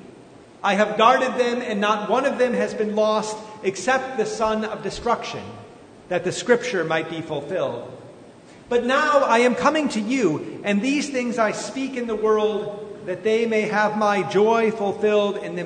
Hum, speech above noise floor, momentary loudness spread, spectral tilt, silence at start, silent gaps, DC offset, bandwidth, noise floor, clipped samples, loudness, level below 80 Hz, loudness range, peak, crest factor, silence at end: none; 24 dB; 10 LU; -4.5 dB/octave; 0 s; none; under 0.1%; 9.6 kHz; -46 dBFS; under 0.1%; -21 LUFS; -58 dBFS; 5 LU; -2 dBFS; 20 dB; 0 s